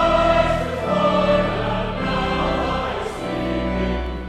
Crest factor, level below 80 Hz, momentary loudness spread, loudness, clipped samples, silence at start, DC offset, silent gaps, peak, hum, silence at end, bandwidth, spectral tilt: 16 dB; -32 dBFS; 8 LU; -21 LUFS; under 0.1%; 0 s; under 0.1%; none; -6 dBFS; none; 0 s; 13 kHz; -6.5 dB/octave